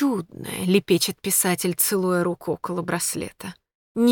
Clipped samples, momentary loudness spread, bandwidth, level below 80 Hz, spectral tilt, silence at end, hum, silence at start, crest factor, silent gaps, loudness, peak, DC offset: under 0.1%; 13 LU; 19.5 kHz; -62 dBFS; -4 dB/octave; 0 s; none; 0 s; 18 dB; 3.75-3.95 s; -23 LUFS; -6 dBFS; under 0.1%